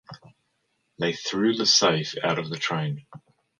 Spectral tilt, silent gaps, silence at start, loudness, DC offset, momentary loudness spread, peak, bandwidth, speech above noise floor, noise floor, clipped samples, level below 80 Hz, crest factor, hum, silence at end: -3.5 dB/octave; none; 0.1 s; -23 LUFS; under 0.1%; 11 LU; -6 dBFS; 11 kHz; 49 dB; -73 dBFS; under 0.1%; -68 dBFS; 20 dB; none; 0.45 s